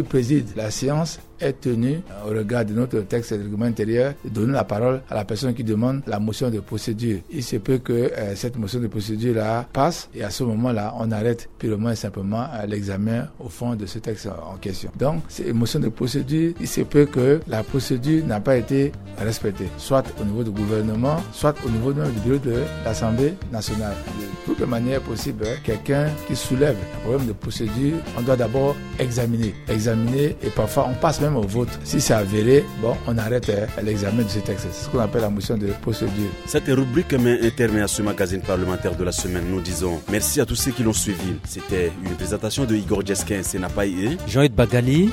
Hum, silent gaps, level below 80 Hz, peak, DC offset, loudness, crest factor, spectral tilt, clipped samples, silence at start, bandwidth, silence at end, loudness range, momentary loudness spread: none; none; -40 dBFS; -2 dBFS; under 0.1%; -23 LUFS; 20 dB; -6 dB/octave; under 0.1%; 0 s; 16 kHz; 0 s; 4 LU; 8 LU